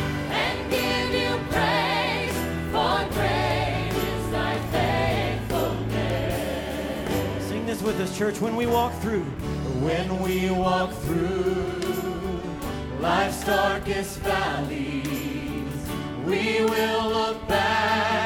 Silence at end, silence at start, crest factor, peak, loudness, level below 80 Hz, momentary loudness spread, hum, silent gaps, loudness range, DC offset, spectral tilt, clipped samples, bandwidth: 0 s; 0 s; 18 dB; -8 dBFS; -25 LUFS; -40 dBFS; 7 LU; none; none; 2 LU; under 0.1%; -5 dB/octave; under 0.1%; 19 kHz